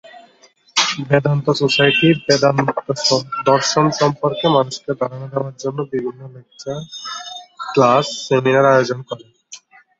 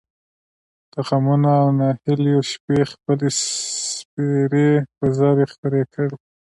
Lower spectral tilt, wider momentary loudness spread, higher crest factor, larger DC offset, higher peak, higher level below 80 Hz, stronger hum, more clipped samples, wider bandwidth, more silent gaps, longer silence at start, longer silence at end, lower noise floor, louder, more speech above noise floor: second, -4.5 dB/octave vs -6 dB/octave; first, 15 LU vs 8 LU; about the same, 18 dB vs 14 dB; neither; first, 0 dBFS vs -6 dBFS; about the same, -58 dBFS vs -58 dBFS; neither; neither; second, 8 kHz vs 11.5 kHz; second, none vs 2.60-2.68 s, 4.05-4.17 s, 5.58-5.63 s; second, 0.15 s vs 0.95 s; about the same, 0.45 s vs 0.4 s; second, -52 dBFS vs under -90 dBFS; first, -16 LUFS vs -19 LUFS; second, 35 dB vs over 72 dB